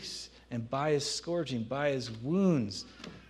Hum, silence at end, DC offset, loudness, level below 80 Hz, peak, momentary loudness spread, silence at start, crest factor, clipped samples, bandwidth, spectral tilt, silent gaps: none; 0.05 s; under 0.1%; -33 LUFS; -62 dBFS; -16 dBFS; 12 LU; 0 s; 16 dB; under 0.1%; 12.5 kHz; -5.5 dB/octave; none